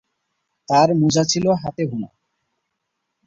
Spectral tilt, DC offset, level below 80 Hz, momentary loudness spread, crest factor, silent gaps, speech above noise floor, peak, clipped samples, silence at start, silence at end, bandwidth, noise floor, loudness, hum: -5 dB/octave; under 0.1%; -56 dBFS; 12 LU; 18 dB; none; 59 dB; -4 dBFS; under 0.1%; 0.7 s; 1.2 s; 8 kHz; -76 dBFS; -18 LUFS; none